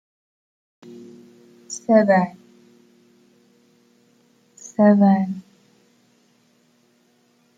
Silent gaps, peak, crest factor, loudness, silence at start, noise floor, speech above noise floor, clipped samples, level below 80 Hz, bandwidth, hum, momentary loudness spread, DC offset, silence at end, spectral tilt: none; -4 dBFS; 20 dB; -18 LUFS; 1.7 s; -61 dBFS; 45 dB; under 0.1%; -72 dBFS; 9 kHz; none; 27 LU; under 0.1%; 2.15 s; -7 dB/octave